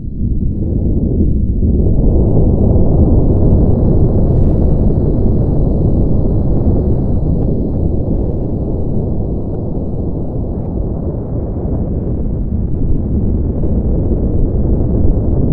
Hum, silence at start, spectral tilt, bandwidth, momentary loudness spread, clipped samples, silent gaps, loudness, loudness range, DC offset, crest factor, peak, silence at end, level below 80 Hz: none; 0 s; -14.5 dB/octave; 1.7 kHz; 8 LU; under 0.1%; none; -15 LUFS; 7 LU; under 0.1%; 12 dB; 0 dBFS; 0 s; -16 dBFS